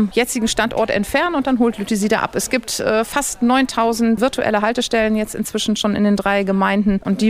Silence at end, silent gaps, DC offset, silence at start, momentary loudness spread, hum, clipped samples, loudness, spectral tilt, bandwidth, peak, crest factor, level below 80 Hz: 0 s; none; under 0.1%; 0 s; 4 LU; none; under 0.1%; -18 LUFS; -4 dB/octave; 16 kHz; -2 dBFS; 14 dB; -42 dBFS